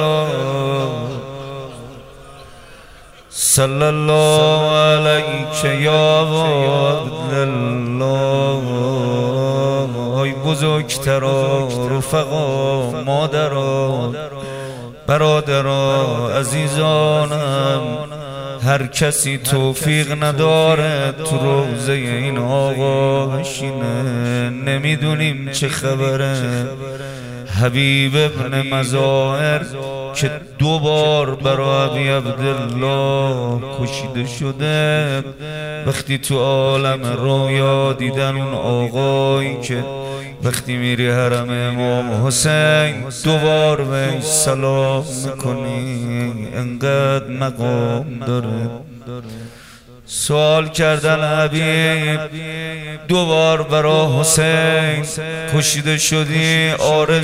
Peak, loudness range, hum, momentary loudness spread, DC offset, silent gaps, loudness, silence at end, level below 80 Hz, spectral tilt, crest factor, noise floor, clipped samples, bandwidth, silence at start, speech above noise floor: 0 dBFS; 5 LU; none; 11 LU; under 0.1%; none; -17 LUFS; 0 s; -46 dBFS; -4.5 dB/octave; 16 dB; -41 dBFS; under 0.1%; 16 kHz; 0 s; 25 dB